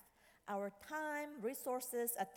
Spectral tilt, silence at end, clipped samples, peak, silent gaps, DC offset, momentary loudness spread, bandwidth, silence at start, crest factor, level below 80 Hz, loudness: -3 dB/octave; 0 s; under 0.1%; -28 dBFS; none; under 0.1%; 6 LU; 19 kHz; 0.25 s; 16 dB; -82 dBFS; -43 LUFS